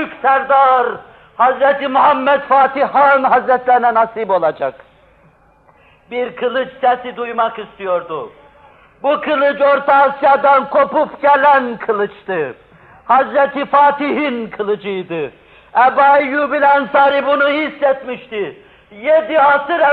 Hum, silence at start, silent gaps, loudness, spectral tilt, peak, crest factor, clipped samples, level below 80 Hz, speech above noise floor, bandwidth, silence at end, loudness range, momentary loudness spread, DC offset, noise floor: none; 0 s; none; -14 LUFS; -7.5 dB/octave; -2 dBFS; 12 dB; under 0.1%; -58 dBFS; 36 dB; 4.8 kHz; 0 s; 8 LU; 12 LU; under 0.1%; -50 dBFS